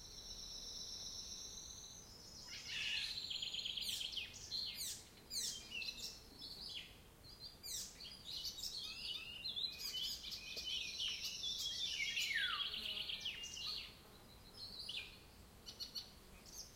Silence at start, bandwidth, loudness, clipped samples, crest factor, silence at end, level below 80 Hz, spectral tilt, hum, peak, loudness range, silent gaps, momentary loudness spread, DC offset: 0 s; 16.5 kHz; -44 LUFS; under 0.1%; 20 dB; 0 s; -66 dBFS; 0.5 dB/octave; none; -28 dBFS; 7 LU; none; 15 LU; under 0.1%